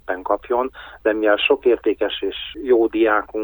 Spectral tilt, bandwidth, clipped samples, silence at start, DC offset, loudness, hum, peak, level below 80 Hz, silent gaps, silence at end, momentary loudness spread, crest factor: -6.5 dB/octave; over 20 kHz; under 0.1%; 0.1 s; under 0.1%; -19 LUFS; none; -4 dBFS; -50 dBFS; none; 0 s; 9 LU; 16 dB